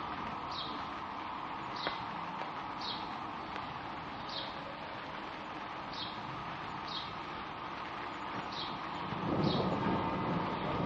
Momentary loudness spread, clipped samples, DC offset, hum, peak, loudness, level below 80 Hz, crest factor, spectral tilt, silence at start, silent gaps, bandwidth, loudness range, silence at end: 9 LU; under 0.1%; under 0.1%; none; -18 dBFS; -39 LUFS; -62 dBFS; 20 dB; -6 dB/octave; 0 s; none; 9 kHz; 5 LU; 0 s